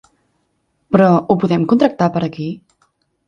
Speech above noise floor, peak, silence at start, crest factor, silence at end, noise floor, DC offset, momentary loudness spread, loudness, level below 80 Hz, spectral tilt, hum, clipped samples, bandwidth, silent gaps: 52 dB; 0 dBFS; 0.9 s; 16 dB; 0.7 s; -66 dBFS; under 0.1%; 14 LU; -15 LUFS; -54 dBFS; -8.5 dB/octave; none; under 0.1%; 7 kHz; none